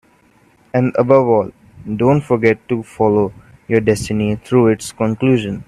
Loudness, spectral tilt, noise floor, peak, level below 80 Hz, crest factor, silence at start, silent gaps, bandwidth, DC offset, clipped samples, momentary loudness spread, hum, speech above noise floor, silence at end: -16 LUFS; -7 dB/octave; -52 dBFS; 0 dBFS; -46 dBFS; 16 dB; 0.75 s; none; 13 kHz; under 0.1%; under 0.1%; 9 LU; none; 38 dB; 0.05 s